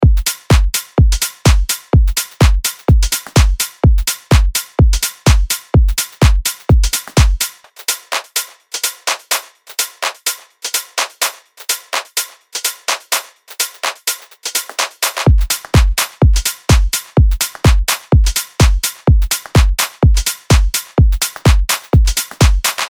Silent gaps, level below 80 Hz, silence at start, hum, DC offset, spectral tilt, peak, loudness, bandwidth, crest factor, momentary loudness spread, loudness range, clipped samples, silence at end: none; -16 dBFS; 0 s; none; under 0.1%; -4 dB/octave; 0 dBFS; -15 LUFS; over 20 kHz; 14 dB; 7 LU; 5 LU; under 0.1%; 0 s